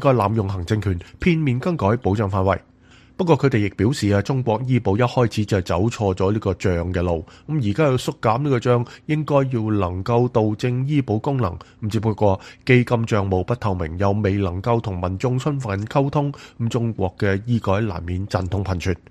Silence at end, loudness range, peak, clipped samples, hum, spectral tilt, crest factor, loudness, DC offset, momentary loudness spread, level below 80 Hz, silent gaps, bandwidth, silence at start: 0.15 s; 2 LU; -2 dBFS; under 0.1%; none; -7.5 dB/octave; 18 dB; -21 LUFS; under 0.1%; 6 LU; -44 dBFS; none; 12.5 kHz; 0 s